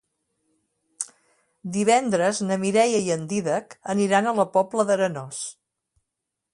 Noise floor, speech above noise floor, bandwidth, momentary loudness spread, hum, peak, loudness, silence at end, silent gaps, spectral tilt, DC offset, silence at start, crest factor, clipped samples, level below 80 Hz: -83 dBFS; 61 dB; 11.5 kHz; 14 LU; none; -6 dBFS; -23 LUFS; 1 s; none; -4.5 dB/octave; under 0.1%; 1 s; 18 dB; under 0.1%; -68 dBFS